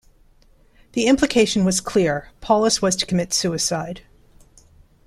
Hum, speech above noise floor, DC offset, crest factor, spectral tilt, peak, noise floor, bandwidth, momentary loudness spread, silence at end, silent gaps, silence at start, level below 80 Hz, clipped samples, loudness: none; 34 dB; under 0.1%; 18 dB; -4 dB/octave; -2 dBFS; -54 dBFS; 14.5 kHz; 11 LU; 1.05 s; none; 0.95 s; -48 dBFS; under 0.1%; -19 LUFS